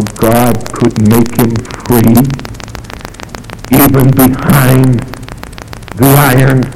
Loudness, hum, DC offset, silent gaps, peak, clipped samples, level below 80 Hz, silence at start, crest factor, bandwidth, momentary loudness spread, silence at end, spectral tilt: -8 LUFS; none; 4%; none; 0 dBFS; 0.8%; -28 dBFS; 0 s; 10 dB; over 20 kHz; 19 LU; 0 s; -6 dB/octave